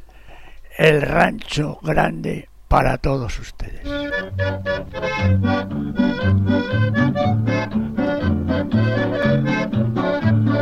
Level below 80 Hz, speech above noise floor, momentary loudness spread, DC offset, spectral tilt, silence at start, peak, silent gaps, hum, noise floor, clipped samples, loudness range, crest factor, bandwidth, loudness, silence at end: -34 dBFS; 21 dB; 8 LU; 0.4%; -7.5 dB/octave; 0 s; -4 dBFS; none; none; -40 dBFS; under 0.1%; 3 LU; 16 dB; 13 kHz; -20 LUFS; 0 s